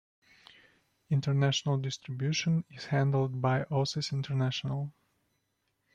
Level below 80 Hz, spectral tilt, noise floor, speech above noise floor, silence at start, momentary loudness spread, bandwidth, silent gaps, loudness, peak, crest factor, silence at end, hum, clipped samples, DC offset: -68 dBFS; -5.5 dB/octave; -79 dBFS; 49 dB; 1.1 s; 7 LU; 7.8 kHz; none; -31 LUFS; -14 dBFS; 18 dB; 1.05 s; none; under 0.1%; under 0.1%